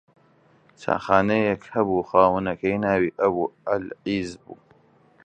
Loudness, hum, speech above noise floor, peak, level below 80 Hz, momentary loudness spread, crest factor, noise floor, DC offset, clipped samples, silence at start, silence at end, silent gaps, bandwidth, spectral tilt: -23 LUFS; none; 36 dB; -2 dBFS; -54 dBFS; 9 LU; 22 dB; -58 dBFS; under 0.1%; under 0.1%; 0.8 s; 0.7 s; none; 9 kHz; -7 dB/octave